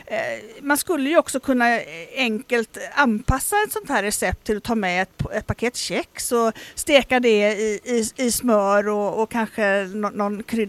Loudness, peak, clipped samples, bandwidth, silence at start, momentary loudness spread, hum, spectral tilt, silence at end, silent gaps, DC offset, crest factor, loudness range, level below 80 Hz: -21 LUFS; 0 dBFS; under 0.1%; 16 kHz; 0.05 s; 8 LU; none; -3.5 dB/octave; 0 s; none; under 0.1%; 20 dB; 3 LU; -40 dBFS